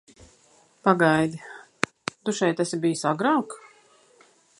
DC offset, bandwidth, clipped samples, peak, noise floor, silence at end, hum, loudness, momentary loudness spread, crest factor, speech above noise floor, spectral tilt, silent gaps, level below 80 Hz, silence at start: under 0.1%; 11.5 kHz; under 0.1%; -2 dBFS; -59 dBFS; 1 s; none; -24 LUFS; 18 LU; 24 dB; 37 dB; -5 dB/octave; none; -66 dBFS; 0.85 s